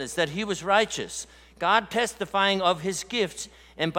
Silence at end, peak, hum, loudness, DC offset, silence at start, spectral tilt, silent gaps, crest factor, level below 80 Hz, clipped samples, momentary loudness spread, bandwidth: 0 s; -6 dBFS; none; -25 LUFS; under 0.1%; 0 s; -3 dB/octave; none; 22 dB; -58 dBFS; under 0.1%; 13 LU; 17 kHz